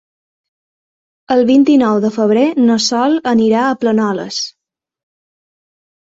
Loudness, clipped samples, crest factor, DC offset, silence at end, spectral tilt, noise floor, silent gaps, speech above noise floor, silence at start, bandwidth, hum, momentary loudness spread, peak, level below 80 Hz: -13 LUFS; under 0.1%; 14 dB; under 0.1%; 1.6 s; -4.5 dB/octave; under -90 dBFS; none; over 78 dB; 1.3 s; 7.8 kHz; none; 9 LU; -2 dBFS; -58 dBFS